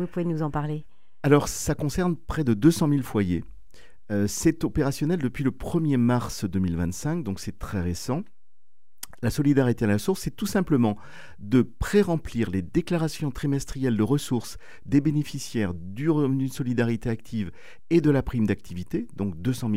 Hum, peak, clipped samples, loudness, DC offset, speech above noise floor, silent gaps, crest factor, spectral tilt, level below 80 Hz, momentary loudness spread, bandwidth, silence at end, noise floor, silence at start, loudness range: none; -6 dBFS; under 0.1%; -26 LUFS; 1%; 57 dB; none; 20 dB; -6.5 dB/octave; -44 dBFS; 10 LU; 16 kHz; 0 s; -82 dBFS; 0 s; 3 LU